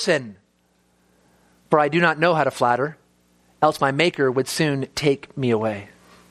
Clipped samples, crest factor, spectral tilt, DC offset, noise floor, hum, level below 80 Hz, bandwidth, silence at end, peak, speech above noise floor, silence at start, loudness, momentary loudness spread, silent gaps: under 0.1%; 22 dB; -5 dB/octave; under 0.1%; -63 dBFS; 60 Hz at -55 dBFS; -60 dBFS; 15 kHz; 0.45 s; -2 dBFS; 43 dB; 0 s; -21 LUFS; 6 LU; none